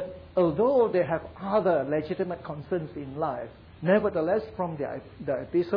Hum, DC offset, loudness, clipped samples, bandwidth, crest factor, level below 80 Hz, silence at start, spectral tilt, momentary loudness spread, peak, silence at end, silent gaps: none; under 0.1%; -28 LUFS; under 0.1%; 5.2 kHz; 16 dB; -56 dBFS; 0 s; -10.5 dB/octave; 12 LU; -10 dBFS; 0 s; none